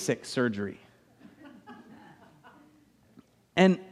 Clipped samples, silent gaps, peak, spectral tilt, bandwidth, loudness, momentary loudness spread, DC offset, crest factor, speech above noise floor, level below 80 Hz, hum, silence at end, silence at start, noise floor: under 0.1%; none; -8 dBFS; -5.5 dB/octave; 13 kHz; -28 LUFS; 28 LU; under 0.1%; 24 dB; 35 dB; -72 dBFS; none; 0.05 s; 0 s; -62 dBFS